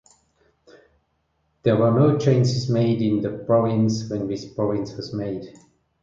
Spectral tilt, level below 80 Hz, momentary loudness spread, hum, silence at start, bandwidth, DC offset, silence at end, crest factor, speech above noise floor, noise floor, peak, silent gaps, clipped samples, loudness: -7.5 dB/octave; -56 dBFS; 11 LU; none; 1.65 s; 7.6 kHz; under 0.1%; 0.5 s; 16 dB; 49 dB; -70 dBFS; -6 dBFS; none; under 0.1%; -22 LUFS